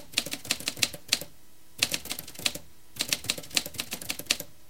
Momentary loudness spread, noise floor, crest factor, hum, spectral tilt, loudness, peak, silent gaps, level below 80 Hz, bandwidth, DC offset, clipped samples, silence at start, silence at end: 9 LU; -57 dBFS; 30 dB; none; -0.5 dB/octave; -29 LUFS; -2 dBFS; none; -60 dBFS; 17 kHz; 0.6%; under 0.1%; 0 s; 0.2 s